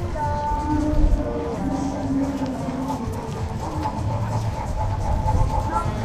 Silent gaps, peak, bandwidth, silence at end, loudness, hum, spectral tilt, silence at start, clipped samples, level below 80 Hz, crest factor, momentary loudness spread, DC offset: none; -8 dBFS; 14 kHz; 0 s; -25 LUFS; none; -7.5 dB/octave; 0 s; under 0.1%; -28 dBFS; 16 dB; 5 LU; under 0.1%